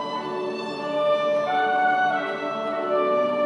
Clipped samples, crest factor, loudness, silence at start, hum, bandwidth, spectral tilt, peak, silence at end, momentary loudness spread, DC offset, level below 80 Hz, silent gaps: under 0.1%; 14 dB; -24 LUFS; 0 s; none; 10 kHz; -5 dB/octave; -10 dBFS; 0 s; 8 LU; under 0.1%; -82 dBFS; none